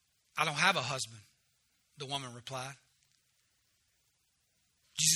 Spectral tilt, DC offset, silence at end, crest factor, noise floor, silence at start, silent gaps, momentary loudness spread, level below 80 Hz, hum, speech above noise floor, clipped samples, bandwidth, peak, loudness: -1 dB/octave; under 0.1%; 0 s; 26 dB; -76 dBFS; 0.35 s; none; 15 LU; -78 dBFS; none; 41 dB; under 0.1%; 19.5 kHz; -12 dBFS; -34 LUFS